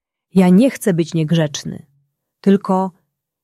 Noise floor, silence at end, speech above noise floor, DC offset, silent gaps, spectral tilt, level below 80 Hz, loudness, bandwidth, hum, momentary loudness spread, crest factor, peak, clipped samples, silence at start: -65 dBFS; 0.55 s; 50 dB; under 0.1%; none; -7 dB/octave; -58 dBFS; -16 LUFS; 13.5 kHz; none; 14 LU; 14 dB; -2 dBFS; under 0.1%; 0.35 s